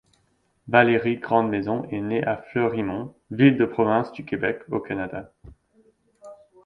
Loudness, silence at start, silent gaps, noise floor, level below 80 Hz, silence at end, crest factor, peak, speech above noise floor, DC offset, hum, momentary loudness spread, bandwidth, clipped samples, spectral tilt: -23 LUFS; 0.65 s; none; -67 dBFS; -58 dBFS; 0.3 s; 20 dB; -4 dBFS; 44 dB; under 0.1%; none; 12 LU; 5.4 kHz; under 0.1%; -9 dB/octave